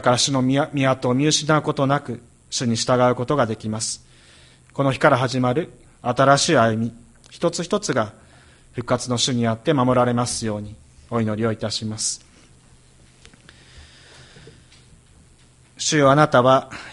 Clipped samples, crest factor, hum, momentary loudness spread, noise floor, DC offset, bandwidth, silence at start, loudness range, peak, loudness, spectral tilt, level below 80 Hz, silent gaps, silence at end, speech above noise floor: under 0.1%; 20 dB; none; 14 LU; -52 dBFS; under 0.1%; 11.5 kHz; 0 s; 8 LU; 0 dBFS; -20 LUFS; -4.5 dB/octave; -52 dBFS; none; 0 s; 33 dB